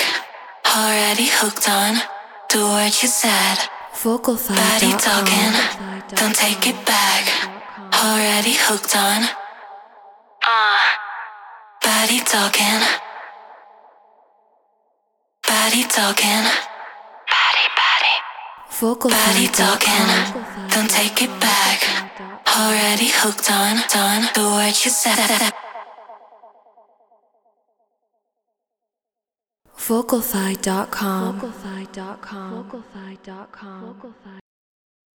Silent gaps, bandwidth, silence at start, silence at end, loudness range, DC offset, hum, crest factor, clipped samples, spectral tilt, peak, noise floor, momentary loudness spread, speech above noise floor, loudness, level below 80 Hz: none; over 20 kHz; 0 s; 0.75 s; 9 LU; under 0.1%; none; 20 dB; under 0.1%; -1.5 dB/octave; 0 dBFS; -88 dBFS; 19 LU; 70 dB; -16 LUFS; -60 dBFS